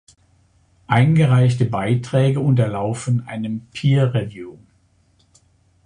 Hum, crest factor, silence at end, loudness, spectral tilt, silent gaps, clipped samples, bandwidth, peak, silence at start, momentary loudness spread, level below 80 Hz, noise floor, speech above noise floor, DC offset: none; 18 dB; 1.35 s; -18 LUFS; -7.5 dB/octave; none; under 0.1%; 10.5 kHz; -2 dBFS; 0.9 s; 13 LU; -50 dBFS; -59 dBFS; 41 dB; under 0.1%